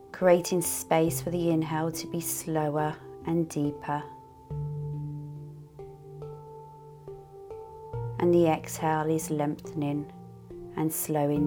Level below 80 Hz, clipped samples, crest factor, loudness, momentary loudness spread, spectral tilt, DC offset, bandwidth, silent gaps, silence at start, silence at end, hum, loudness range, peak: -56 dBFS; under 0.1%; 20 dB; -29 LUFS; 22 LU; -5.5 dB/octave; under 0.1%; 18.5 kHz; none; 0 s; 0 s; none; 12 LU; -10 dBFS